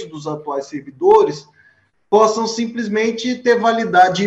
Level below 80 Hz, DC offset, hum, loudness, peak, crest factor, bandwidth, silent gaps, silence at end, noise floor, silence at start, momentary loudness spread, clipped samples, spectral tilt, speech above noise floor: -60 dBFS; under 0.1%; none; -16 LUFS; -2 dBFS; 14 dB; 8 kHz; none; 0 s; -56 dBFS; 0 s; 13 LU; under 0.1%; -4.5 dB/octave; 40 dB